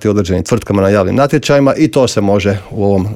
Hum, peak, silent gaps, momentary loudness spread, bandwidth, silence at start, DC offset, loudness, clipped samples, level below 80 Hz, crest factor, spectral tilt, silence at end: none; 0 dBFS; none; 4 LU; 15.5 kHz; 0 s; under 0.1%; -12 LUFS; under 0.1%; -42 dBFS; 12 dB; -6.5 dB/octave; 0 s